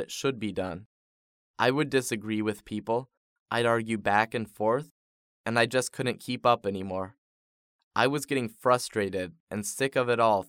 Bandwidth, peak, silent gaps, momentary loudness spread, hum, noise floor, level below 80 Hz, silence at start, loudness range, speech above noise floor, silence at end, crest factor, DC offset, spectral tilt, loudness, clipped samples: 18 kHz; -8 dBFS; 0.86-1.54 s, 3.17-3.46 s, 4.91-5.44 s, 7.18-7.91 s, 9.40-9.47 s; 10 LU; none; under -90 dBFS; -68 dBFS; 0 s; 2 LU; over 62 dB; 0.05 s; 22 dB; under 0.1%; -4.5 dB/octave; -28 LUFS; under 0.1%